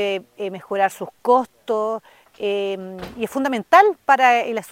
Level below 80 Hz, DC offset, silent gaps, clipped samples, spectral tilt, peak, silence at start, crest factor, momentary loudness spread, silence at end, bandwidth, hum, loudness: -60 dBFS; under 0.1%; none; under 0.1%; -4 dB/octave; 0 dBFS; 0 s; 20 dB; 16 LU; 0.05 s; 16.5 kHz; none; -19 LUFS